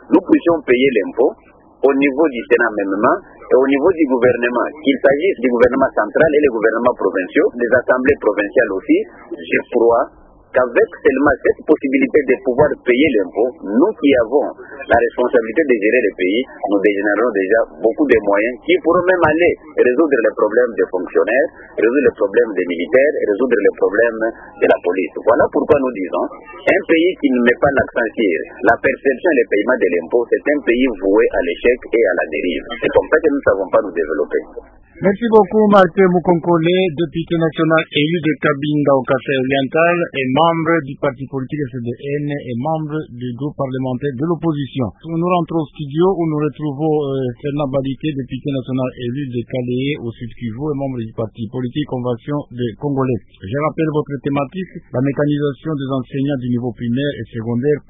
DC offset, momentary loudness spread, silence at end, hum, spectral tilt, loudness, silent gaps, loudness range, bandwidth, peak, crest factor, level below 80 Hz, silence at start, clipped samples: under 0.1%; 9 LU; 0.1 s; none; -9 dB/octave; -16 LUFS; none; 7 LU; 3.9 kHz; 0 dBFS; 16 dB; -46 dBFS; 0.1 s; under 0.1%